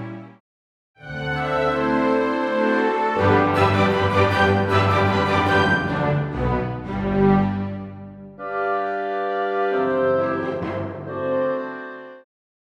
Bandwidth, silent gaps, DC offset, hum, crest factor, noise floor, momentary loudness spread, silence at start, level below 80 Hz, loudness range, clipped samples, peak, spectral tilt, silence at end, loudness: 11.5 kHz; 0.40-0.94 s; under 0.1%; none; 18 dB; under -90 dBFS; 14 LU; 0 s; -44 dBFS; 5 LU; under 0.1%; -4 dBFS; -7 dB/octave; 0.5 s; -21 LUFS